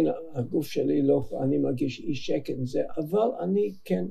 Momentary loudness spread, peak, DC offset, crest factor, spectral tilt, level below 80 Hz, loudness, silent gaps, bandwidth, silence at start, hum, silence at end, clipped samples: 6 LU; -12 dBFS; under 0.1%; 16 dB; -7.5 dB/octave; -56 dBFS; -28 LUFS; none; 14.5 kHz; 0 s; none; 0 s; under 0.1%